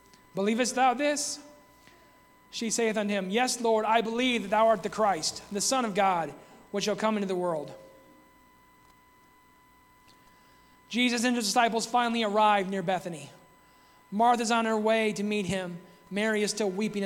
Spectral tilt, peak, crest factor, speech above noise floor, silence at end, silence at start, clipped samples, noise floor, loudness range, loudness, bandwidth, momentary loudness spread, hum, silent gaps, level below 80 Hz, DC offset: -3.5 dB/octave; -10 dBFS; 20 dB; 32 dB; 0 s; 0.35 s; under 0.1%; -60 dBFS; 8 LU; -27 LUFS; 17 kHz; 12 LU; 60 Hz at -65 dBFS; none; -68 dBFS; under 0.1%